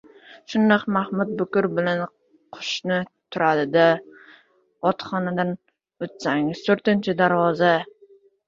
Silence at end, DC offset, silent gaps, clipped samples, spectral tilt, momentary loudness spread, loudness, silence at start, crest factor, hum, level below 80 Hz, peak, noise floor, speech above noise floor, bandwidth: 0.65 s; under 0.1%; none; under 0.1%; -6 dB/octave; 11 LU; -22 LUFS; 0.3 s; 20 dB; none; -66 dBFS; -2 dBFS; -56 dBFS; 35 dB; 7.6 kHz